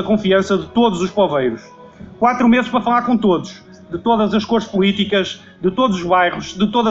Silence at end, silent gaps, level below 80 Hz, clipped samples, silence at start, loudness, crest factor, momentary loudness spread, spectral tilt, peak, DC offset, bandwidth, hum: 0 s; none; -48 dBFS; under 0.1%; 0 s; -16 LUFS; 14 dB; 7 LU; -6 dB/octave; -2 dBFS; under 0.1%; 7.8 kHz; none